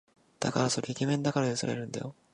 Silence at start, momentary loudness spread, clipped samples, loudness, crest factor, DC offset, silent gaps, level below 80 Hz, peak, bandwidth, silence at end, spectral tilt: 0.4 s; 8 LU; under 0.1%; -31 LUFS; 20 dB; under 0.1%; none; -68 dBFS; -12 dBFS; 11.5 kHz; 0.2 s; -5 dB/octave